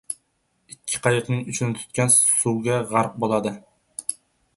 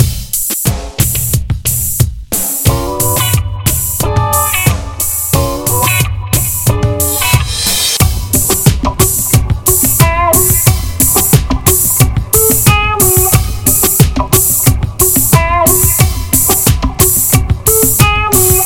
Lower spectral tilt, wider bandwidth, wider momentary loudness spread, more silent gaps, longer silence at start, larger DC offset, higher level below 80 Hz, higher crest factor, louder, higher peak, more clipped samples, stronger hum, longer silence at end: about the same, -4 dB/octave vs -3.5 dB/octave; second, 12 kHz vs over 20 kHz; first, 19 LU vs 6 LU; neither; about the same, 0.1 s vs 0 s; second, under 0.1% vs 0.7%; second, -60 dBFS vs -20 dBFS; first, 20 dB vs 10 dB; second, -21 LUFS vs -10 LUFS; about the same, -2 dBFS vs 0 dBFS; second, under 0.1% vs 1%; neither; first, 0.45 s vs 0 s